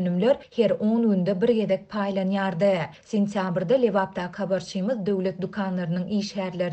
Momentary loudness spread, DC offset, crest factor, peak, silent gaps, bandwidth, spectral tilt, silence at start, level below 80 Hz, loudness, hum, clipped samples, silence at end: 6 LU; under 0.1%; 14 dB; -10 dBFS; none; 8.6 kHz; -7 dB/octave; 0 s; -64 dBFS; -25 LUFS; none; under 0.1%; 0 s